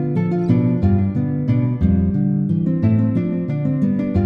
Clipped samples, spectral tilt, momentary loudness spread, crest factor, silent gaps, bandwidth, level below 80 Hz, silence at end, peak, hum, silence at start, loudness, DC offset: under 0.1%; -11.5 dB/octave; 4 LU; 14 dB; none; 5 kHz; -36 dBFS; 0 s; -4 dBFS; none; 0 s; -18 LUFS; under 0.1%